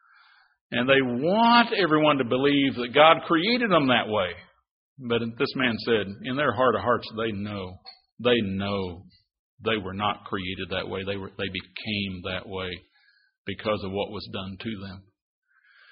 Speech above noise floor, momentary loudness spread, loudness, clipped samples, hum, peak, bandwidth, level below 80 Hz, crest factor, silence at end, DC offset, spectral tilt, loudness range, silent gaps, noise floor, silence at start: 39 dB; 16 LU; -25 LUFS; under 0.1%; none; -2 dBFS; 5.4 kHz; -60 dBFS; 24 dB; 0.9 s; under 0.1%; -3 dB/octave; 11 LU; 4.71-4.96 s, 8.12-8.17 s, 9.39-9.58 s, 13.38-13.45 s; -64 dBFS; 0.7 s